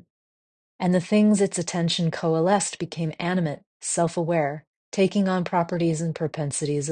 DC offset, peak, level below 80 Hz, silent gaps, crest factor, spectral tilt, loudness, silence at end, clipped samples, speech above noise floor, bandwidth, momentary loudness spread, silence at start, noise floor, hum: under 0.1%; -8 dBFS; -64 dBFS; 3.66-3.80 s, 4.67-4.92 s; 16 dB; -5 dB/octave; -24 LUFS; 0 s; under 0.1%; over 67 dB; 10 kHz; 9 LU; 0.8 s; under -90 dBFS; none